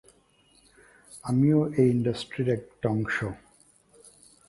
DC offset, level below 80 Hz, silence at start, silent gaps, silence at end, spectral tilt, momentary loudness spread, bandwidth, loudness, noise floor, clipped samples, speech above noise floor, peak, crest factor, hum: under 0.1%; -58 dBFS; 1.1 s; none; 1.1 s; -7.5 dB/octave; 16 LU; 11.5 kHz; -26 LUFS; -62 dBFS; under 0.1%; 37 dB; -10 dBFS; 18 dB; none